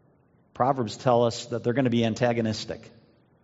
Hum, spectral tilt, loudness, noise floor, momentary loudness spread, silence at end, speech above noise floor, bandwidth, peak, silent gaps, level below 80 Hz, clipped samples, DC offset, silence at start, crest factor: none; -5.5 dB/octave; -25 LUFS; -62 dBFS; 9 LU; 0.55 s; 37 dB; 8 kHz; -8 dBFS; none; -64 dBFS; under 0.1%; under 0.1%; 0.55 s; 20 dB